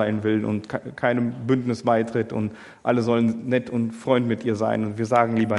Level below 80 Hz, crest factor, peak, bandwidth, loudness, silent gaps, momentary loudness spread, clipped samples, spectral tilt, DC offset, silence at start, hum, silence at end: -64 dBFS; 20 dB; -4 dBFS; 11 kHz; -23 LUFS; none; 7 LU; under 0.1%; -7.5 dB/octave; under 0.1%; 0 s; none; 0 s